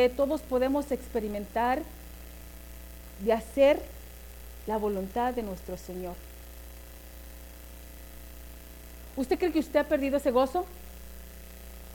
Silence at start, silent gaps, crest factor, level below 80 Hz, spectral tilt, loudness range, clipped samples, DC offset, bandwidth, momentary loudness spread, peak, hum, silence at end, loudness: 0 s; none; 18 dB; -46 dBFS; -5.5 dB/octave; 13 LU; under 0.1%; under 0.1%; 18 kHz; 21 LU; -12 dBFS; 60 Hz at -45 dBFS; 0 s; -29 LUFS